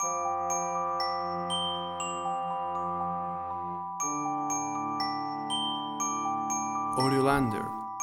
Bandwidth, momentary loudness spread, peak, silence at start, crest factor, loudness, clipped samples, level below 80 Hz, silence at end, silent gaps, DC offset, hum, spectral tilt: 18.5 kHz; 7 LU; -12 dBFS; 0 s; 20 dB; -31 LUFS; under 0.1%; -58 dBFS; 0 s; none; under 0.1%; none; -3.5 dB/octave